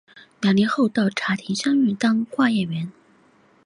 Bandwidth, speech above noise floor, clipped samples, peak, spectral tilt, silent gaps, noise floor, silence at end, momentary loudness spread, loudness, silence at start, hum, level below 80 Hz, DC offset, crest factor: 11 kHz; 36 dB; under 0.1%; -8 dBFS; -5.5 dB/octave; none; -57 dBFS; 0.75 s; 7 LU; -21 LUFS; 0.15 s; none; -64 dBFS; under 0.1%; 14 dB